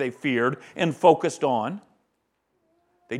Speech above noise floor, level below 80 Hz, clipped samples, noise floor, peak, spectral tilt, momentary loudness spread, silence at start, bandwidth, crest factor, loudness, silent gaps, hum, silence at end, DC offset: 51 dB; -76 dBFS; under 0.1%; -74 dBFS; -4 dBFS; -5.5 dB/octave; 10 LU; 0 s; 12 kHz; 22 dB; -23 LUFS; none; none; 0 s; under 0.1%